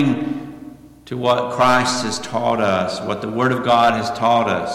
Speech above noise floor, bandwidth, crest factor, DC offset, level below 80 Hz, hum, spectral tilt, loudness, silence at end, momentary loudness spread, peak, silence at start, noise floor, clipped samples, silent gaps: 21 dB; 15.5 kHz; 12 dB; under 0.1%; -52 dBFS; none; -4.5 dB/octave; -18 LUFS; 0 s; 11 LU; -6 dBFS; 0 s; -39 dBFS; under 0.1%; none